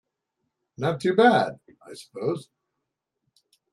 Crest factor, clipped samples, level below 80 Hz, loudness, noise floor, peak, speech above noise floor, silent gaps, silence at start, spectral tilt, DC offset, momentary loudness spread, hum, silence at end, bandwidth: 20 dB; under 0.1%; -72 dBFS; -23 LUFS; -82 dBFS; -6 dBFS; 59 dB; none; 0.8 s; -6 dB/octave; under 0.1%; 24 LU; none; 1.3 s; 12 kHz